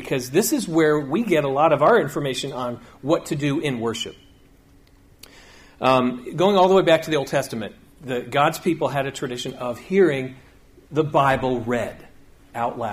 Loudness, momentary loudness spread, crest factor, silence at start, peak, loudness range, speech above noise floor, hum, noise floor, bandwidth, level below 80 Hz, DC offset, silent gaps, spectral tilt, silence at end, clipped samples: -21 LUFS; 13 LU; 18 dB; 0 s; -4 dBFS; 5 LU; 31 dB; none; -52 dBFS; 15.5 kHz; -52 dBFS; under 0.1%; none; -5 dB/octave; 0 s; under 0.1%